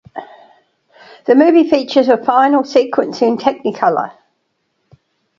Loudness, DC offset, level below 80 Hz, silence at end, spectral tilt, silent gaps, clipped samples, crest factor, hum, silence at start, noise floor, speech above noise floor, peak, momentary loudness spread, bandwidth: -13 LUFS; under 0.1%; -62 dBFS; 1.3 s; -5.5 dB/octave; none; under 0.1%; 14 dB; none; 0.15 s; -67 dBFS; 55 dB; 0 dBFS; 14 LU; 7.4 kHz